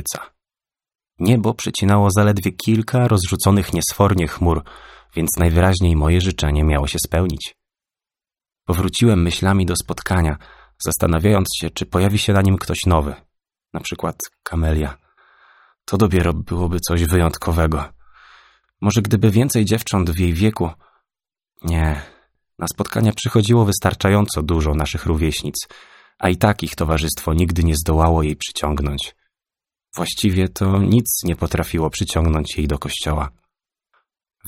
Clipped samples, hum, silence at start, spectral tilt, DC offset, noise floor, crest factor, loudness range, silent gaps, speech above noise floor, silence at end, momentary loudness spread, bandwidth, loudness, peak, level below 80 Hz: under 0.1%; none; 0 s; -5.5 dB/octave; under 0.1%; under -90 dBFS; 18 dB; 4 LU; none; over 73 dB; 0 s; 11 LU; 17 kHz; -18 LUFS; 0 dBFS; -28 dBFS